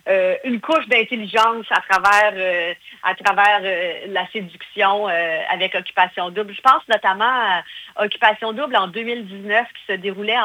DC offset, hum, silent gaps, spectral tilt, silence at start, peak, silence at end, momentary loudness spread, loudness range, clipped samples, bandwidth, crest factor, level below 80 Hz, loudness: under 0.1%; none; none; -3 dB/octave; 0.05 s; 0 dBFS; 0 s; 10 LU; 3 LU; under 0.1%; over 20 kHz; 18 dB; -64 dBFS; -18 LUFS